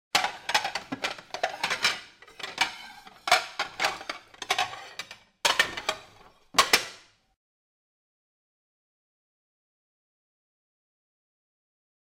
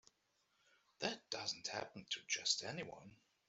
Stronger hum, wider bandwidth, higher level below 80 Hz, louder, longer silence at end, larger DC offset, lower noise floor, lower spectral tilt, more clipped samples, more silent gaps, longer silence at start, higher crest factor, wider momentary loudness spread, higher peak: neither; first, 16 kHz vs 8.2 kHz; first, -66 dBFS vs -84 dBFS; first, -27 LUFS vs -42 LUFS; first, 5.15 s vs 0.35 s; neither; second, -55 dBFS vs -81 dBFS; about the same, 0 dB/octave vs -1 dB/octave; neither; neither; second, 0.15 s vs 1 s; about the same, 24 dB vs 26 dB; first, 16 LU vs 11 LU; first, -10 dBFS vs -20 dBFS